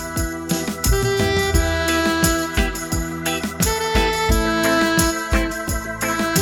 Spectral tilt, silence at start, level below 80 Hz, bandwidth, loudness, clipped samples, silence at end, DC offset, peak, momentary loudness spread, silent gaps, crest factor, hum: -4 dB/octave; 0 s; -28 dBFS; over 20 kHz; -19 LUFS; under 0.1%; 0 s; under 0.1%; -2 dBFS; 6 LU; none; 18 dB; none